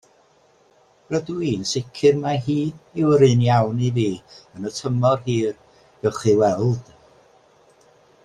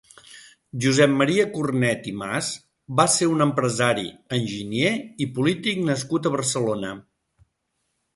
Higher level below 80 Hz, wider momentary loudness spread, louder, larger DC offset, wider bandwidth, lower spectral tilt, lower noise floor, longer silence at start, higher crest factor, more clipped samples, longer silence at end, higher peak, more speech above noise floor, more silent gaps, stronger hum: first, -54 dBFS vs -60 dBFS; about the same, 12 LU vs 10 LU; about the same, -21 LUFS vs -22 LUFS; neither; about the same, 10.5 kHz vs 11.5 kHz; first, -6.5 dB/octave vs -4.5 dB/octave; second, -57 dBFS vs -75 dBFS; first, 1.1 s vs 0.3 s; about the same, 18 dB vs 20 dB; neither; first, 1.45 s vs 1.15 s; about the same, -4 dBFS vs -2 dBFS; second, 37 dB vs 53 dB; neither; neither